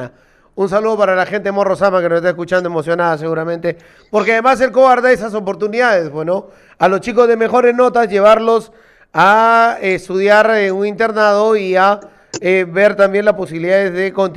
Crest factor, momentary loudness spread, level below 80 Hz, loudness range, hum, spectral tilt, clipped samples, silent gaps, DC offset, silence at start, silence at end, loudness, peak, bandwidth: 12 dB; 10 LU; -52 dBFS; 3 LU; none; -5.5 dB/octave; under 0.1%; none; under 0.1%; 0 s; 0 s; -13 LUFS; 0 dBFS; 12 kHz